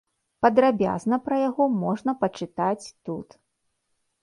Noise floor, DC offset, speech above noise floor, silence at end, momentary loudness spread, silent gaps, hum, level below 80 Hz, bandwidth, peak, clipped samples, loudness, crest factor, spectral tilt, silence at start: -75 dBFS; under 0.1%; 52 dB; 1 s; 15 LU; none; none; -62 dBFS; 11.5 kHz; -4 dBFS; under 0.1%; -24 LUFS; 20 dB; -7 dB/octave; 0.4 s